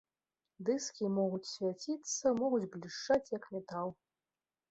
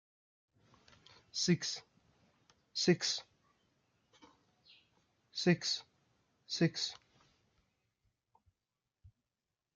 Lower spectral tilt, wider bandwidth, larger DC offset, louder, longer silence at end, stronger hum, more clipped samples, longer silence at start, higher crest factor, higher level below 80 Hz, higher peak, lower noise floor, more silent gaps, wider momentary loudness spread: about the same, -4.5 dB/octave vs -4 dB/octave; second, 8.2 kHz vs 9.2 kHz; neither; about the same, -36 LUFS vs -35 LUFS; about the same, 0.75 s vs 0.7 s; neither; neither; second, 0.6 s vs 1.35 s; second, 18 dB vs 24 dB; about the same, -76 dBFS vs -80 dBFS; about the same, -18 dBFS vs -18 dBFS; about the same, under -90 dBFS vs under -90 dBFS; neither; second, 9 LU vs 12 LU